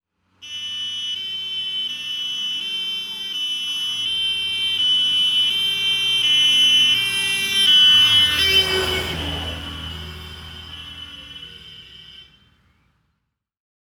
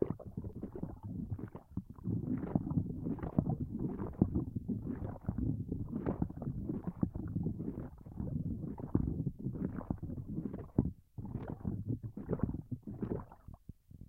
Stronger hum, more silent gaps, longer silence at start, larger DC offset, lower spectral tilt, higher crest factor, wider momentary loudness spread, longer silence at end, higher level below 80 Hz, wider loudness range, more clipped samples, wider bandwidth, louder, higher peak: neither; neither; first, 0.4 s vs 0 s; neither; second, -1 dB/octave vs -12 dB/octave; second, 16 dB vs 26 dB; first, 22 LU vs 10 LU; first, 1.6 s vs 0.05 s; about the same, -46 dBFS vs -50 dBFS; first, 18 LU vs 3 LU; neither; first, 19 kHz vs 3 kHz; first, -16 LUFS vs -40 LUFS; first, -6 dBFS vs -12 dBFS